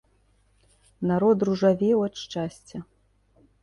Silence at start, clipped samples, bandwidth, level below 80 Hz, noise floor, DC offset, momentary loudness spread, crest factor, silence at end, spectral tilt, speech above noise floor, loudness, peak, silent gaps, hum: 1 s; under 0.1%; 11.5 kHz; -60 dBFS; -64 dBFS; under 0.1%; 19 LU; 18 dB; 0.8 s; -7 dB/octave; 40 dB; -24 LUFS; -8 dBFS; none; none